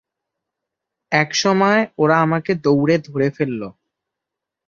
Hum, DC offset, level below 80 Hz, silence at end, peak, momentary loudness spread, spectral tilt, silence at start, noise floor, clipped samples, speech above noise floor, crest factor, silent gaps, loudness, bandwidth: none; under 0.1%; -60 dBFS; 0.95 s; -2 dBFS; 8 LU; -5.5 dB/octave; 1.1 s; -84 dBFS; under 0.1%; 67 dB; 18 dB; none; -17 LUFS; 7.6 kHz